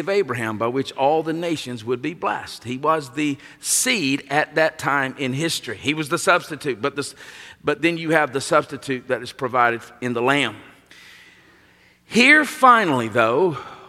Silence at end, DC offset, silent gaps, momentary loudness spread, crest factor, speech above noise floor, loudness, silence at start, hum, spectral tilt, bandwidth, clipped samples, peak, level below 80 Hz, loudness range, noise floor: 0 s; under 0.1%; none; 13 LU; 20 dB; 34 dB; -20 LUFS; 0 s; none; -3.5 dB/octave; 16 kHz; under 0.1%; -2 dBFS; -64 dBFS; 5 LU; -54 dBFS